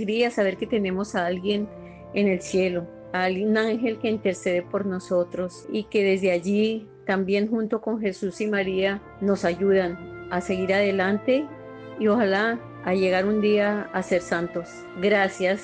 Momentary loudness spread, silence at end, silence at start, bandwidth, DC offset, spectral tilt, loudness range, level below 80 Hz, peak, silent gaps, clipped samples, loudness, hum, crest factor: 9 LU; 0 s; 0 s; 9.4 kHz; under 0.1%; -6 dB/octave; 2 LU; -58 dBFS; -10 dBFS; none; under 0.1%; -24 LUFS; none; 14 dB